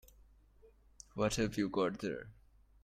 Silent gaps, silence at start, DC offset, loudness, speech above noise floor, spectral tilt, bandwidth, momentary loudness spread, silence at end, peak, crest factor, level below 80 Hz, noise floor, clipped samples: none; 0.65 s; under 0.1%; -37 LUFS; 29 dB; -5 dB/octave; 16 kHz; 19 LU; 0.5 s; -18 dBFS; 22 dB; -60 dBFS; -64 dBFS; under 0.1%